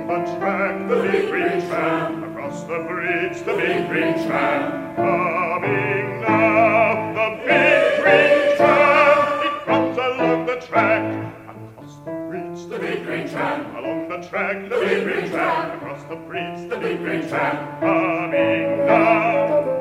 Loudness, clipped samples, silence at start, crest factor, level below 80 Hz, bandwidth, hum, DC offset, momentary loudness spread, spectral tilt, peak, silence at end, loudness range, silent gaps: -19 LUFS; under 0.1%; 0 s; 18 dB; -60 dBFS; 15 kHz; none; under 0.1%; 14 LU; -6 dB/octave; -2 dBFS; 0 s; 9 LU; none